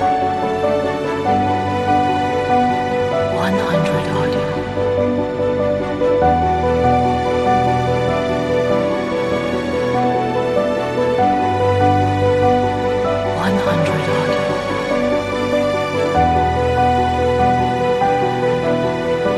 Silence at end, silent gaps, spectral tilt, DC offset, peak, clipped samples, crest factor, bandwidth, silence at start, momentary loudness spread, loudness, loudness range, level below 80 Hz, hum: 0 s; none; -6.5 dB/octave; under 0.1%; -2 dBFS; under 0.1%; 14 dB; 12.5 kHz; 0 s; 4 LU; -17 LUFS; 2 LU; -36 dBFS; none